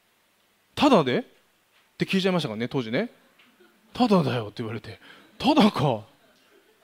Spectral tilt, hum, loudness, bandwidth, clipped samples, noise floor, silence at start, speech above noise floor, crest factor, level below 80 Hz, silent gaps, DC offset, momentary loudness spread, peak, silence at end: -6.5 dB/octave; none; -24 LUFS; 16 kHz; under 0.1%; -65 dBFS; 0.75 s; 42 dB; 20 dB; -62 dBFS; none; under 0.1%; 15 LU; -6 dBFS; 0.8 s